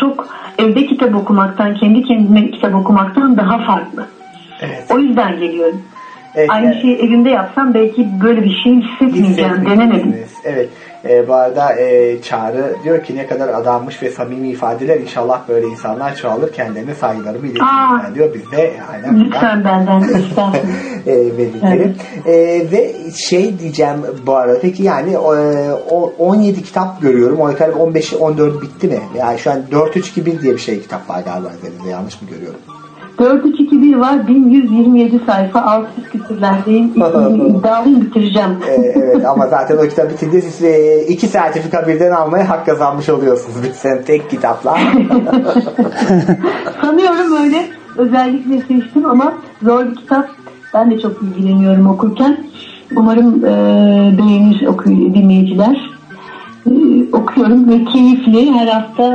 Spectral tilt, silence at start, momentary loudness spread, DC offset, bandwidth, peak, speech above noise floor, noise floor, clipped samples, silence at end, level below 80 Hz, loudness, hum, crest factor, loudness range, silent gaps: -7 dB/octave; 0 s; 11 LU; under 0.1%; 8.8 kHz; 0 dBFS; 21 dB; -32 dBFS; under 0.1%; 0 s; -56 dBFS; -12 LUFS; none; 12 dB; 5 LU; none